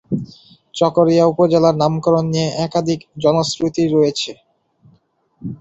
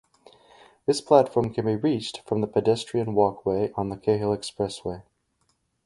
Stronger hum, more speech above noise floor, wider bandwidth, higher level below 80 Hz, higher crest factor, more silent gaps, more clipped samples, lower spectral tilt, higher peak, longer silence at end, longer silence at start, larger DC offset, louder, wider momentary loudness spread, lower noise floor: neither; second, 43 dB vs 47 dB; second, 8.2 kHz vs 11.5 kHz; about the same, -54 dBFS vs -56 dBFS; second, 16 dB vs 22 dB; neither; neither; about the same, -6 dB/octave vs -6.5 dB/octave; about the same, -2 dBFS vs -2 dBFS; second, 0.05 s vs 0.85 s; second, 0.1 s vs 0.9 s; neither; first, -16 LUFS vs -25 LUFS; first, 13 LU vs 10 LU; second, -58 dBFS vs -71 dBFS